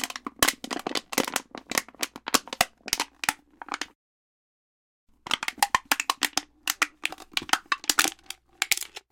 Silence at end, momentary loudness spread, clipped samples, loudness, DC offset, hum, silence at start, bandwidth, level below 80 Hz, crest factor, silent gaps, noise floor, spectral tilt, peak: 0.15 s; 11 LU; under 0.1%; -27 LUFS; under 0.1%; none; 0 s; 17 kHz; -60 dBFS; 26 dB; 3.95-5.07 s; -45 dBFS; 0 dB/octave; -4 dBFS